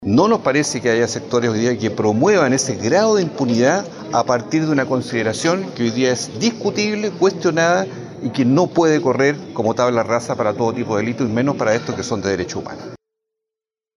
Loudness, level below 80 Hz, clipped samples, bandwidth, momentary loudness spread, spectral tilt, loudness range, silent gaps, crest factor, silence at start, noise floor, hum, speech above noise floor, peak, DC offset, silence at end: -18 LUFS; -58 dBFS; under 0.1%; 11.5 kHz; 7 LU; -5 dB/octave; 3 LU; none; 14 dB; 0 s; -88 dBFS; none; 70 dB; -4 dBFS; under 0.1%; 1 s